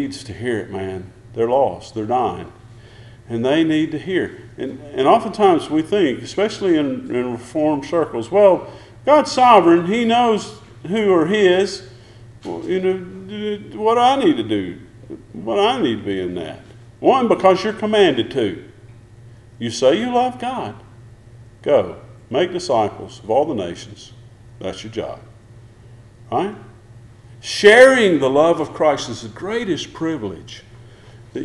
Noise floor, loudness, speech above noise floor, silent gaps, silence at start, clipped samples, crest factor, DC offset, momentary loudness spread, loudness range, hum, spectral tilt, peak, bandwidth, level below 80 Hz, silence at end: -43 dBFS; -17 LUFS; 26 dB; none; 0 s; under 0.1%; 18 dB; under 0.1%; 18 LU; 8 LU; none; -5 dB/octave; 0 dBFS; 12 kHz; -52 dBFS; 0 s